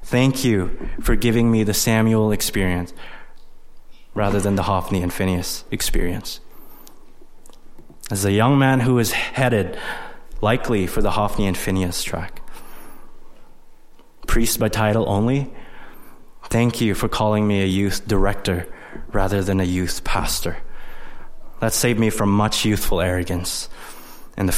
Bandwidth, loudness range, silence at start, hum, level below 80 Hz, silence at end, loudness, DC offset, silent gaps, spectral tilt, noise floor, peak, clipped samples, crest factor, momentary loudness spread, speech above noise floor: 16.5 kHz; 5 LU; 0 s; none; -30 dBFS; 0 s; -20 LUFS; under 0.1%; none; -5 dB/octave; -42 dBFS; -4 dBFS; under 0.1%; 16 dB; 16 LU; 23 dB